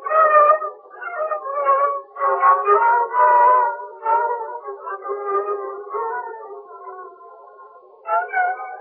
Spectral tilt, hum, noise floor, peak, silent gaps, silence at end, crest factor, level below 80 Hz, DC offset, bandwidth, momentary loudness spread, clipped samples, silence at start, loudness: -6 dB/octave; none; -45 dBFS; -4 dBFS; none; 0 s; 16 dB; -80 dBFS; under 0.1%; 3.4 kHz; 21 LU; under 0.1%; 0 s; -18 LUFS